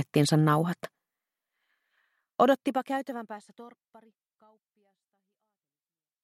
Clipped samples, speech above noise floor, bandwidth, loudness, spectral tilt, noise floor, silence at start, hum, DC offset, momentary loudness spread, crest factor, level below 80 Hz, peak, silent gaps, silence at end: under 0.1%; over 62 dB; 14.5 kHz; -27 LUFS; -6 dB/octave; under -90 dBFS; 0 s; none; under 0.1%; 20 LU; 22 dB; -76 dBFS; -8 dBFS; none; 2.55 s